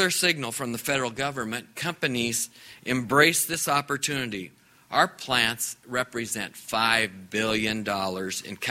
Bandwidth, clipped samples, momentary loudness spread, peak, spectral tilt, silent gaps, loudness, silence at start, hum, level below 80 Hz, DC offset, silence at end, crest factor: 16 kHz; under 0.1%; 10 LU; -4 dBFS; -2.5 dB/octave; none; -26 LUFS; 0 s; none; -60 dBFS; under 0.1%; 0 s; 24 dB